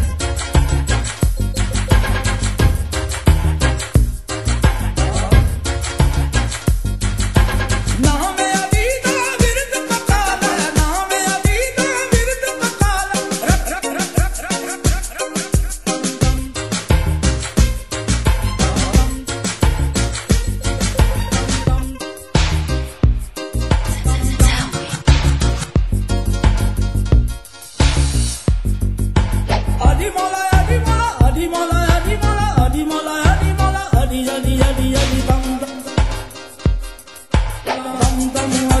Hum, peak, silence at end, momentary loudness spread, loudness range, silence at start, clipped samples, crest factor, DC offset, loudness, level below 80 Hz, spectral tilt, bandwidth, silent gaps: none; 0 dBFS; 0 s; 6 LU; 3 LU; 0 s; under 0.1%; 16 dB; 0.5%; -18 LUFS; -20 dBFS; -4.5 dB/octave; 13 kHz; none